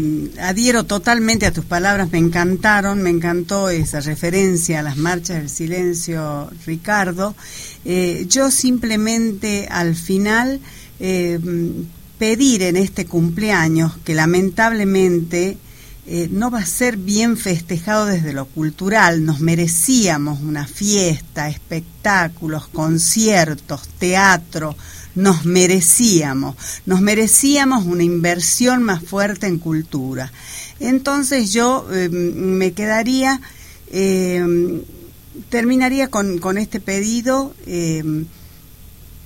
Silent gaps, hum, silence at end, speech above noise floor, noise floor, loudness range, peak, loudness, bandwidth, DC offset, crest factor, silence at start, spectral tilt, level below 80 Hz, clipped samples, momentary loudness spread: none; none; 0.05 s; 24 dB; -41 dBFS; 5 LU; 0 dBFS; -17 LUFS; 16.5 kHz; 0.3%; 18 dB; 0 s; -4 dB/octave; -40 dBFS; under 0.1%; 11 LU